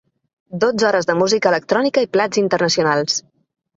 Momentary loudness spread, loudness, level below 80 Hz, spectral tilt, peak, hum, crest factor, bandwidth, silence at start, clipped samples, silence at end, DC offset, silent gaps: 5 LU; -17 LUFS; -62 dBFS; -3.5 dB/octave; -2 dBFS; none; 16 dB; 8 kHz; 0.5 s; under 0.1%; 0.55 s; under 0.1%; none